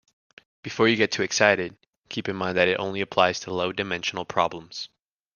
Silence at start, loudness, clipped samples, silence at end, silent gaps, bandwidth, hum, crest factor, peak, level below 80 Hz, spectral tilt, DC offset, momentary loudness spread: 0.65 s; -24 LUFS; under 0.1%; 0.5 s; 1.98-2.02 s; 10.5 kHz; none; 24 dB; -2 dBFS; -64 dBFS; -3.5 dB/octave; under 0.1%; 15 LU